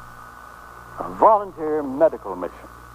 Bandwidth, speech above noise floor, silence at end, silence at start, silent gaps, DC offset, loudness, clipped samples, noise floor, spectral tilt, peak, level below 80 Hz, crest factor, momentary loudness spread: 15.5 kHz; 21 dB; 0 s; 0 s; none; under 0.1%; -20 LUFS; under 0.1%; -41 dBFS; -7 dB/octave; -2 dBFS; -50 dBFS; 20 dB; 25 LU